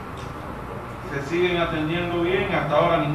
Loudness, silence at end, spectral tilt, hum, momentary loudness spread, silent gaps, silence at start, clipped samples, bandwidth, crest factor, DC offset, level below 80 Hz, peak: -24 LUFS; 0 s; -6.5 dB/octave; none; 14 LU; none; 0 s; under 0.1%; 14 kHz; 18 dB; 0.2%; -42 dBFS; -6 dBFS